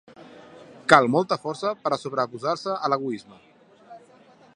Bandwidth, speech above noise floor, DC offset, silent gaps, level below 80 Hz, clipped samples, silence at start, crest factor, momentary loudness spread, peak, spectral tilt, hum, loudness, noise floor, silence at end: 11.5 kHz; 30 dB; under 0.1%; none; -68 dBFS; under 0.1%; 0.2 s; 26 dB; 13 LU; 0 dBFS; -5 dB/octave; none; -23 LUFS; -54 dBFS; 0.6 s